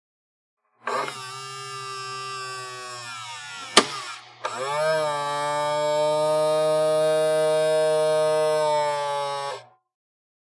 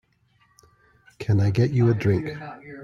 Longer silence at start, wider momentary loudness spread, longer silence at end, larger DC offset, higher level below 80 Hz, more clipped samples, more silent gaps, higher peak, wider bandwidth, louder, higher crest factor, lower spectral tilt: second, 0.85 s vs 1.2 s; second, 13 LU vs 16 LU; first, 0.8 s vs 0 s; neither; second, -80 dBFS vs -52 dBFS; neither; neither; first, 0 dBFS vs -8 dBFS; first, 11.5 kHz vs 7.2 kHz; about the same, -24 LUFS vs -23 LUFS; first, 24 dB vs 16 dB; second, -2.5 dB/octave vs -8.5 dB/octave